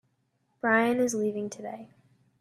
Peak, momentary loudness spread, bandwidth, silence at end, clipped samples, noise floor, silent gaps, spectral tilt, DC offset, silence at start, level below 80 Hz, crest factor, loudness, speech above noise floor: -10 dBFS; 17 LU; 14 kHz; 0.55 s; under 0.1%; -74 dBFS; none; -4.5 dB/octave; under 0.1%; 0.65 s; -74 dBFS; 20 dB; -27 LUFS; 46 dB